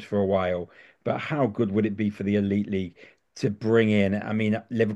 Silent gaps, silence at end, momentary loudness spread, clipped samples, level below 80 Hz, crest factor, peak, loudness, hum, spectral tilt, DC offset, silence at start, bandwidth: none; 0 s; 9 LU; under 0.1%; -64 dBFS; 16 dB; -8 dBFS; -25 LUFS; none; -8 dB/octave; under 0.1%; 0 s; 8.4 kHz